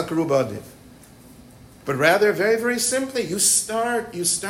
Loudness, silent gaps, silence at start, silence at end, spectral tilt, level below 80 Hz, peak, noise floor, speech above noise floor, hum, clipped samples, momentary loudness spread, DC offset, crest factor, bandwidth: -20 LUFS; none; 0 s; 0 s; -2.5 dB/octave; -58 dBFS; -4 dBFS; -46 dBFS; 25 dB; none; under 0.1%; 11 LU; under 0.1%; 18 dB; 16.5 kHz